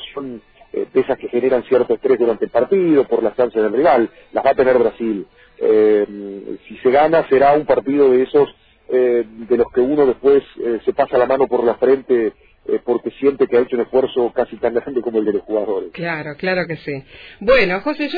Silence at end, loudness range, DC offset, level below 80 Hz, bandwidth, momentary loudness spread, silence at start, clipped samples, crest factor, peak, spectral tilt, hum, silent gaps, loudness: 0 s; 4 LU; under 0.1%; -48 dBFS; 5 kHz; 10 LU; 0 s; under 0.1%; 14 dB; -2 dBFS; -9 dB/octave; none; none; -17 LUFS